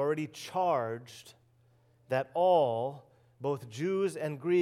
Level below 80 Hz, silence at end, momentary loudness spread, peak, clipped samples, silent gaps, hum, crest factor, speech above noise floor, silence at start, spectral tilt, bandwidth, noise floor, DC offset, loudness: -80 dBFS; 0 s; 15 LU; -14 dBFS; under 0.1%; none; none; 16 dB; 35 dB; 0 s; -6.5 dB/octave; 15 kHz; -66 dBFS; under 0.1%; -31 LUFS